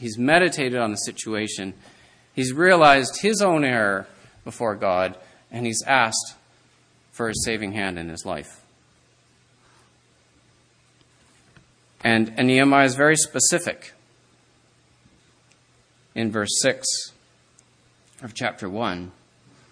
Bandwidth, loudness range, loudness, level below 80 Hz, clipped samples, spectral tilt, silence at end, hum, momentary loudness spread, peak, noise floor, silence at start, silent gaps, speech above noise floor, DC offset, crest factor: 11 kHz; 10 LU; -21 LUFS; -58 dBFS; under 0.1%; -3.5 dB/octave; 0.6 s; none; 18 LU; 0 dBFS; -60 dBFS; 0 s; none; 38 dB; under 0.1%; 24 dB